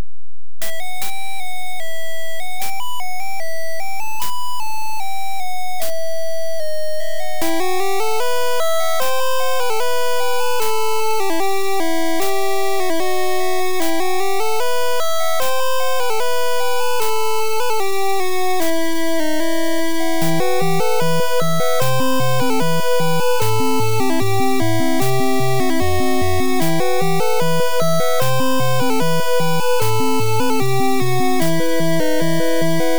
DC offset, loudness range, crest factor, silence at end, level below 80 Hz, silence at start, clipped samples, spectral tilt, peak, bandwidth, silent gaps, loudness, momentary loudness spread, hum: 20%; 8 LU; 10 dB; 0 s; -50 dBFS; 0 s; under 0.1%; -4.5 dB/octave; -6 dBFS; over 20 kHz; none; -20 LUFS; 8 LU; none